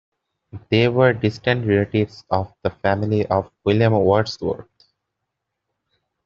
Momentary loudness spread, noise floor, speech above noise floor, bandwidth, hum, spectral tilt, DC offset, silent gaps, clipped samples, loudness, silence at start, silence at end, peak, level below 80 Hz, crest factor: 8 LU; -79 dBFS; 60 dB; 7.2 kHz; none; -5.5 dB/octave; under 0.1%; none; under 0.1%; -20 LUFS; 0.55 s; 1.65 s; -2 dBFS; -52 dBFS; 18 dB